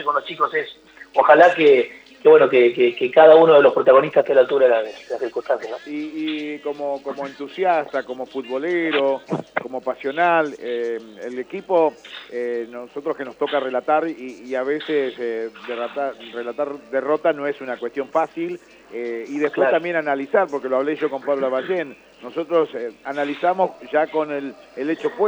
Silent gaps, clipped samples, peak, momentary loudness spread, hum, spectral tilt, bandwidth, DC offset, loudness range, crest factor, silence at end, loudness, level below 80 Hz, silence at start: none; under 0.1%; 0 dBFS; 17 LU; none; -6 dB/octave; 8 kHz; under 0.1%; 11 LU; 20 dB; 0 s; -20 LUFS; -70 dBFS; 0 s